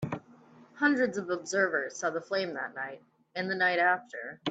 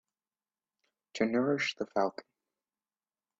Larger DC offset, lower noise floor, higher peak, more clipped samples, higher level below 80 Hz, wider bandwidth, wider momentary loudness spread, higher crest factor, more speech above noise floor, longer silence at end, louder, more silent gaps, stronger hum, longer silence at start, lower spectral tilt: neither; second, -56 dBFS vs under -90 dBFS; about the same, -14 dBFS vs -16 dBFS; neither; about the same, -74 dBFS vs -78 dBFS; first, 9 kHz vs 7.8 kHz; about the same, 14 LU vs 14 LU; about the same, 18 dB vs 20 dB; second, 26 dB vs over 59 dB; second, 0 s vs 1.2 s; about the same, -30 LUFS vs -32 LUFS; neither; neither; second, 0 s vs 1.15 s; about the same, -4 dB/octave vs -5 dB/octave